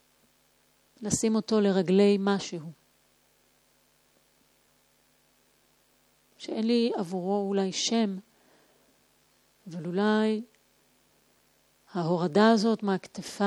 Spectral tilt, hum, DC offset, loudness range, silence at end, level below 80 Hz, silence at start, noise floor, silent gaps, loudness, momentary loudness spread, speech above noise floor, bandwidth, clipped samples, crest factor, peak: -5 dB/octave; none; under 0.1%; 6 LU; 0 s; -68 dBFS; 1 s; -67 dBFS; none; -27 LUFS; 18 LU; 41 dB; 12.5 kHz; under 0.1%; 22 dB; -8 dBFS